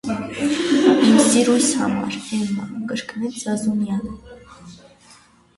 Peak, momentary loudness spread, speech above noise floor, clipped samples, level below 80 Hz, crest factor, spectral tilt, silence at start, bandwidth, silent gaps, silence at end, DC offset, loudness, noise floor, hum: -2 dBFS; 14 LU; 29 dB; under 0.1%; -54 dBFS; 18 dB; -4 dB/octave; 0.05 s; 11.5 kHz; none; 0.8 s; under 0.1%; -19 LUFS; -51 dBFS; none